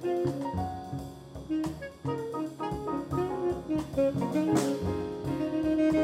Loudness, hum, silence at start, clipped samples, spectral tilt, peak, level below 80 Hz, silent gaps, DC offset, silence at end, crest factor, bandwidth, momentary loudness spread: -31 LUFS; none; 0 s; under 0.1%; -7 dB/octave; -14 dBFS; -50 dBFS; none; under 0.1%; 0 s; 16 dB; 15.5 kHz; 10 LU